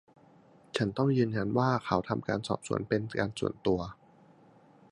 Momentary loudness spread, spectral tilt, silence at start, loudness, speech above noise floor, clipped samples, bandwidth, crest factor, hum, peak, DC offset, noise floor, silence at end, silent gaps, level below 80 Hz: 6 LU; -6.5 dB/octave; 0.75 s; -31 LUFS; 29 dB; under 0.1%; 11.5 kHz; 22 dB; none; -10 dBFS; under 0.1%; -59 dBFS; 1 s; none; -58 dBFS